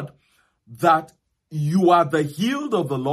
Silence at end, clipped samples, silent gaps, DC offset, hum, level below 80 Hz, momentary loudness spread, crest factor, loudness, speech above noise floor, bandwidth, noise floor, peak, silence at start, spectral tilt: 0 s; under 0.1%; none; under 0.1%; none; -66 dBFS; 10 LU; 18 dB; -20 LUFS; 44 dB; 15 kHz; -64 dBFS; -2 dBFS; 0 s; -6.5 dB/octave